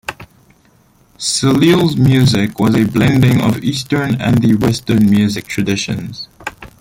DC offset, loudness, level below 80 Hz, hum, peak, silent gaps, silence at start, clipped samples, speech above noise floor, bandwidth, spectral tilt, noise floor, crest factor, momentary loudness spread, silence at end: under 0.1%; -13 LUFS; -42 dBFS; none; 0 dBFS; none; 0.1 s; under 0.1%; 38 dB; 16.5 kHz; -5.5 dB/octave; -51 dBFS; 12 dB; 14 LU; 0.15 s